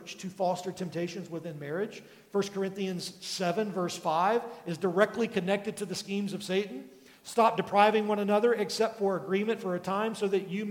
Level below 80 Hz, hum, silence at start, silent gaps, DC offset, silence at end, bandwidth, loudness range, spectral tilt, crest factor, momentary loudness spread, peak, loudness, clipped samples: -78 dBFS; none; 0 s; none; under 0.1%; 0 s; 17 kHz; 6 LU; -5 dB/octave; 22 dB; 11 LU; -8 dBFS; -30 LUFS; under 0.1%